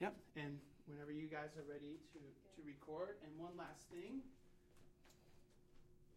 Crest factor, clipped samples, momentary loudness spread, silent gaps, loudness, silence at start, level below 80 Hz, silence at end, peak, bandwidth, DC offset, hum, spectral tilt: 22 dB; under 0.1%; 10 LU; none; -54 LUFS; 0 s; -74 dBFS; 0 s; -32 dBFS; 16 kHz; under 0.1%; none; -6 dB/octave